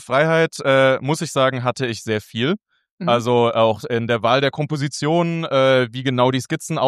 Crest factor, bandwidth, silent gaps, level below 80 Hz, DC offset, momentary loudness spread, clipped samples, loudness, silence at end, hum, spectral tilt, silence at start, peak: 16 dB; 13.5 kHz; 2.91-2.98 s; -64 dBFS; under 0.1%; 8 LU; under 0.1%; -19 LUFS; 0 s; none; -5.5 dB/octave; 0 s; -2 dBFS